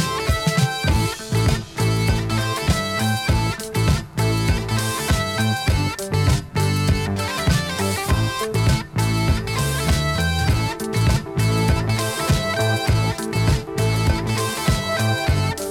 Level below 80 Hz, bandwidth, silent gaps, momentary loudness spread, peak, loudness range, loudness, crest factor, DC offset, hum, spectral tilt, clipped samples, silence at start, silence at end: -28 dBFS; 17.5 kHz; none; 3 LU; -4 dBFS; 1 LU; -21 LUFS; 16 dB; under 0.1%; none; -5 dB/octave; under 0.1%; 0 s; 0 s